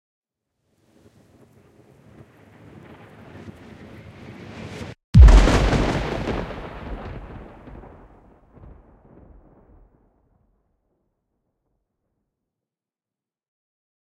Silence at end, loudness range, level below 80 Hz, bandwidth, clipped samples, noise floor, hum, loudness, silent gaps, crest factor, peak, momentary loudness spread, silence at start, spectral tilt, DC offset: 6.9 s; 23 LU; -24 dBFS; 9.4 kHz; under 0.1%; under -90 dBFS; none; -17 LUFS; 5.04-5.13 s; 24 dB; 0 dBFS; 30 LU; 3.45 s; -6.5 dB/octave; under 0.1%